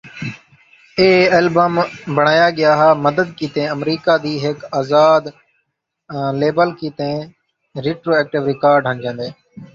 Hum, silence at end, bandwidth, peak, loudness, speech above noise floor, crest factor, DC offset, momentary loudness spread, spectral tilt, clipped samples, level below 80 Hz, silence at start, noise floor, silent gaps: none; 0.1 s; 7.4 kHz; 0 dBFS; -16 LUFS; 56 dB; 16 dB; under 0.1%; 15 LU; -6.5 dB/octave; under 0.1%; -56 dBFS; 0.05 s; -72 dBFS; none